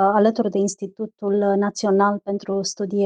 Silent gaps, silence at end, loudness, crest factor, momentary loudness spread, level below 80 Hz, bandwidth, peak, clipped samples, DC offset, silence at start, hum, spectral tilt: none; 0 s; -21 LUFS; 14 dB; 9 LU; -70 dBFS; 9.6 kHz; -6 dBFS; under 0.1%; under 0.1%; 0 s; none; -5.5 dB/octave